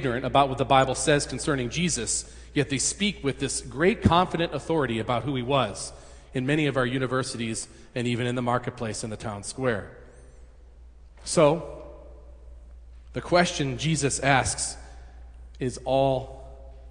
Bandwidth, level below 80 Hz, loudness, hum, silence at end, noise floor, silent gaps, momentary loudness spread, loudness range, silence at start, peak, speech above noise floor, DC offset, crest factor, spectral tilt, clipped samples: 10.5 kHz; -46 dBFS; -26 LUFS; none; 0 s; -49 dBFS; none; 13 LU; 5 LU; 0 s; -4 dBFS; 23 dB; under 0.1%; 22 dB; -4.5 dB/octave; under 0.1%